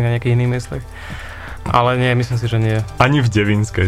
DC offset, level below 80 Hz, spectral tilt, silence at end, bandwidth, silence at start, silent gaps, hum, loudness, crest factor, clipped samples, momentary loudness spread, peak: under 0.1%; -36 dBFS; -6.5 dB/octave; 0 s; 11.5 kHz; 0 s; none; none; -16 LUFS; 16 dB; under 0.1%; 16 LU; 0 dBFS